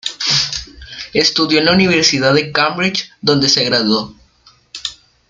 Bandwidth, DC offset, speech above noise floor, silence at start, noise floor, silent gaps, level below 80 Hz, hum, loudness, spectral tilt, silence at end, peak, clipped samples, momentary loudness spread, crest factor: 11 kHz; under 0.1%; 37 dB; 0.05 s; -50 dBFS; none; -46 dBFS; none; -13 LUFS; -3.5 dB/octave; 0.35 s; 0 dBFS; under 0.1%; 15 LU; 16 dB